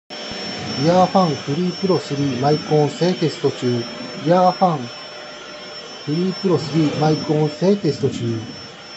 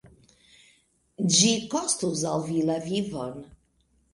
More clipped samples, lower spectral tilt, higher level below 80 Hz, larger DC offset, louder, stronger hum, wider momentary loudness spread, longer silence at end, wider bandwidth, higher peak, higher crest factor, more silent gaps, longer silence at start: neither; first, -6.5 dB/octave vs -3.5 dB/octave; about the same, -60 dBFS vs -62 dBFS; neither; first, -19 LUFS vs -25 LUFS; neither; about the same, 16 LU vs 15 LU; second, 0 s vs 0.7 s; second, 8.2 kHz vs 11.5 kHz; first, -2 dBFS vs -6 dBFS; about the same, 18 dB vs 22 dB; neither; about the same, 0.1 s vs 0.05 s